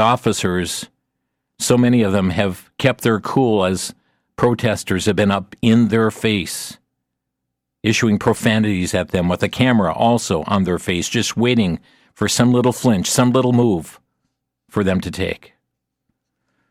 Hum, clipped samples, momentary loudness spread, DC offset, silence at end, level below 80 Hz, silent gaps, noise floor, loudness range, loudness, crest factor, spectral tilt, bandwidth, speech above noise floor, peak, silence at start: none; under 0.1%; 9 LU; under 0.1%; 1.35 s; -48 dBFS; none; -78 dBFS; 3 LU; -18 LUFS; 16 dB; -5 dB/octave; 16 kHz; 62 dB; -2 dBFS; 0 s